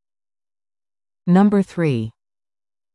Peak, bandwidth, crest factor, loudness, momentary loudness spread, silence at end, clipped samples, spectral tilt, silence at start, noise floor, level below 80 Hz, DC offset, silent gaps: -6 dBFS; 10.5 kHz; 16 dB; -18 LUFS; 14 LU; 0.85 s; under 0.1%; -9 dB/octave; 1.25 s; under -90 dBFS; -58 dBFS; under 0.1%; none